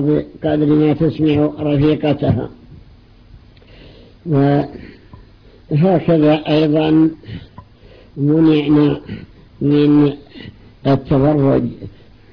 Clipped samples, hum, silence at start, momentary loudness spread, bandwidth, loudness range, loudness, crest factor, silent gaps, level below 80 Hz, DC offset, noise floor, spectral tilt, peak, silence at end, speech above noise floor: under 0.1%; none; 0 s; 20 LU; 5.4 kHz; 5 LU; -15 LUFS; 12 dB; none; -42 dBFS; under 0.1%; -44 dBFS; -10.5 dB/octave; -4 dBFS; 0.45 s; 30 dB